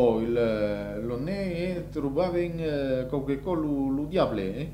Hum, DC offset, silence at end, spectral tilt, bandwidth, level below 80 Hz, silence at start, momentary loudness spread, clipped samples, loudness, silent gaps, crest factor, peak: 50 Hz at -45 dBFS; under 0.1%; 0 s; -8 dB/octave; 16 kHz; -46 dBFS; 0 s; 6 LU; under 0.1%; -28 LUFS; none; 16 dB; -10 dBFS